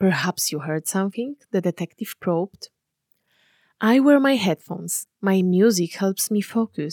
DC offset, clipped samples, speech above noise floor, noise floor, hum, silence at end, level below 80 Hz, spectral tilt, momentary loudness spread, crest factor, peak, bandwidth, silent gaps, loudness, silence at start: under 0.1%; under 0.1%; 49 dB; -70 dBFS; none; 0 s; -74 dBFS; -5 dB/octave; 13 LU; 16 dB; -6 dBFS; 18.5 kHz; none; -22 LUFS; 0 s